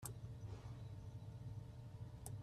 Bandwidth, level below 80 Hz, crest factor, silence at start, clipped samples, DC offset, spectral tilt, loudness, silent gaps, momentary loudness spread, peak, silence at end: 14 kHz; -62 dBFS; 20 dB; 0 s; under 0.1%; under 0.1%; -5.5 dB/octave; -54 LUFS; none; 2 LU; -32 dBFS; 0 s